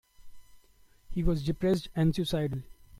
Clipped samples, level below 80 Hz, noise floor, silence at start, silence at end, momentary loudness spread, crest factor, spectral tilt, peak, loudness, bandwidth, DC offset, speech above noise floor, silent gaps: under 0.1%; -42 dBFS; -60 dBFS; 0.25 s; 0.3 s; 8 LU; 16 dB; -7 dB/octave; -16 dBFS; -30 LUFS; 15 kHz; under 0.1%; 31 dB; none